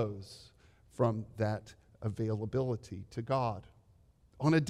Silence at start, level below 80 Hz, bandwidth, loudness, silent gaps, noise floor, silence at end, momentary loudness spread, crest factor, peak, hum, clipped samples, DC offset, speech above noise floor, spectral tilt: 0 s; -64 dBFS; 12 kHz; -36 LUFS; none; -65 dBFS; 0 s; 14 LU; 20 dB; -16 dBFS; none; under 0.1%; under 0.1%; 31 dB; -7.5 dB/octave